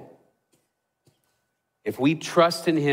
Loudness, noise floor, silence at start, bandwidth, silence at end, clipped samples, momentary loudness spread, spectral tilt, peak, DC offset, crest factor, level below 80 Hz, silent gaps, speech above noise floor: -23 LUFS; -76 dBFS; 0 s; 16 kHz; 0 s; under 0.1%; 14 LU; -5.5 dB/octave; -6 dBFS; under 0.1%; 20 dB; -72 dBFS; none; 54 dB